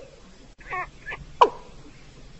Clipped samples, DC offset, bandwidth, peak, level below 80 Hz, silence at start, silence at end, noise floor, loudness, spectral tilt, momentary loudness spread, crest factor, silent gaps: under 0.1%; under 0.1%; 8.2 kHz; -4 dBFS; -48 dBFS; 0 s; 0 s; -48 dBFS; -25 LUFS; -4 dB/octave; 22 LU; 24 dB; none